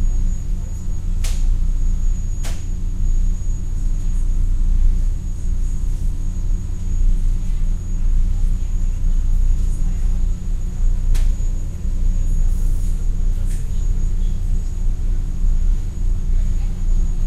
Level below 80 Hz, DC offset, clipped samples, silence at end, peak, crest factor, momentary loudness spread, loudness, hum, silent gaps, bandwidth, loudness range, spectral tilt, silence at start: -16 dBFS; under 0.1%; under 0.1%; 0 s; -4 dBFS; 12 dB; 4 LU; -25 LUFS; none; none; 8.4 kHz; 1 LU; -6.5 dB/octave; 0 s